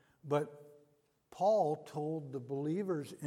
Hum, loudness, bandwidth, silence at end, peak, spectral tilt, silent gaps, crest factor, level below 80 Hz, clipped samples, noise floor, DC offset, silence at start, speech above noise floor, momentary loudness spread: none; -36 LUFS; 15 kHz; 0 s; -20 dBFS; -7.5 dB/octave; none; 18 dB; -84 dBFS; under 0.1%; -72 dBFS; under 0.1%; 0.25 s; 37 dB; 10 LU